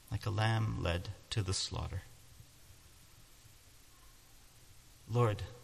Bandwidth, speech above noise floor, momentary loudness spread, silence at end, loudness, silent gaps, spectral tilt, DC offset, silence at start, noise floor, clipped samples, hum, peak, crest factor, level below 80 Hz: 14 kHz; 25 dB; 25 LU; 0 s; -36 LUFS; none; -5 dB/octave; under 0.1%; 0.1 s; -60 dBFS; under 0.1%; none; -20 dBFS; 20 dB; -52 dBFS